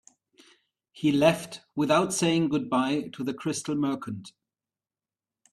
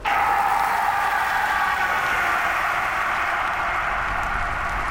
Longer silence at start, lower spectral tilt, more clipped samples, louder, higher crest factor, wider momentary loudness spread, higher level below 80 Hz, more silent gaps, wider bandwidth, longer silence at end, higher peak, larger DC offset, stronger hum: first, 0.95 s vs 0 s; first, -5 dB/octave vs -2.5 dB/octave; neither; second, -26 LUFS vs -21 LUFS; first, 22 dB vs 14 dB; first, 11 LU vs 4 LU; second, -66 dBFS vs -40 dBFS; neither; second, 13.5 kHz vs 17 kHz; first, 1.25 s vs 0 s; about the same, -6 dBFS vs -8 dBFS; neither; neither